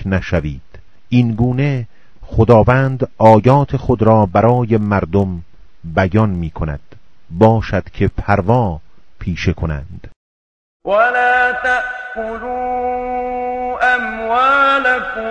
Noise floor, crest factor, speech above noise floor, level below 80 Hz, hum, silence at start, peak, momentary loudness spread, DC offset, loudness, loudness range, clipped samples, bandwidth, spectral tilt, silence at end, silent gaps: under -90 dBFS; 16 dB; over 76 dB; -34 dBFS; none; 0 s; 0 dBFS; 14 LU; under 0.1%; -15 LUFS; 5 LU; 0.2%; 8.4 kHz; -8 dB/octave; 0 s; 10.16-10.80 s